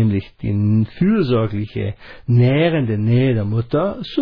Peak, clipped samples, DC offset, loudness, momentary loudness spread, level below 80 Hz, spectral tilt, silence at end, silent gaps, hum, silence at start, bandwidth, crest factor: -4 dBFS; under 0.1%; under 0.1%; -18 LUFS; 9 LU; -44 dBFS; -10.5 dB/octave; 0 s; none; none; 0 s; 5.2 kHz; 12 dB